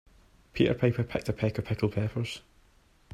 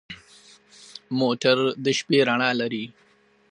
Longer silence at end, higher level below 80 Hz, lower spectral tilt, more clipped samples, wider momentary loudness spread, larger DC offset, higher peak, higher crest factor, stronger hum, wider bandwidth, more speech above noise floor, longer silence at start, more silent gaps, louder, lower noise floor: first, 0.75 s vs 0.6 s; first, -52 dBFS vs -70 dBFS; first, -7.5 dB/octave vs -4.5 dB/octave; neither; second, 11 LU vs 21 LU; neither; second, -12 dBFS vs -4 dBFS; about the same, 20 dB vs 20 dB; neither; first, 13.5 kHz vs 10.5 kHz; first, 34 dB vs 30 dB; first, 0.55 s vs 0.1 s; neither; second, -30 LUFS vs -22 LUFS; first, -62 dBFS vs -53 dBFS